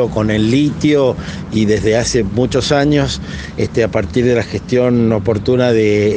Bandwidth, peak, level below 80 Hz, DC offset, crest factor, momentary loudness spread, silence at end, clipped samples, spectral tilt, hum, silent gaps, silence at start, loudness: 10 kHz; 0 dBFS; -34 dBFS; under 0.1%; 14 dB; 7 LU; 0 s; under 0.1%; -6 dB/octave; none; none; 0 s; -14 LUFS